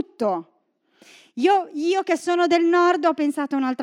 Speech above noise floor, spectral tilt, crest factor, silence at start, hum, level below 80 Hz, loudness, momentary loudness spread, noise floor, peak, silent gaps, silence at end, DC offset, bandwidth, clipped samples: 42 dB; -4 dB/octave; 14 dB; 0.2 s; none; -88 dBFS; -21 LUFS; 8 LU; -63 dBFS; -6 dBFS; none; 0 s; under 0.1%; 12 kHz; under 0.1%